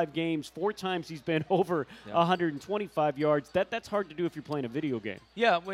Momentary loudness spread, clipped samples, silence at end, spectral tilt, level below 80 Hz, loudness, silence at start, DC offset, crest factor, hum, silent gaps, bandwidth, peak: 7 LU; under 0.1%; 0 s; -6.5 dB/octave; -68 dBFS; -30 LUFS; 0 s; under 0.1%; 18 dB; none; none; 14 kHz; -12 dBFS